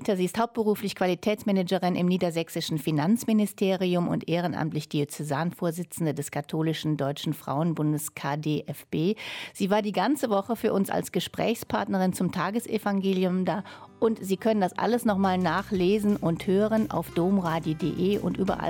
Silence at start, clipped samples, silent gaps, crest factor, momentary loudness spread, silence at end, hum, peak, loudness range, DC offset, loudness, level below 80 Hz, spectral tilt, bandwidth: 0 s; under 0.1%; none; 14 dB; 6 LU; 0 s; none; -12 dBFS; 4 LU; under 0.1%; -27 LUFS; -58 dBFS; -6 dB/octave; 17.5 kHz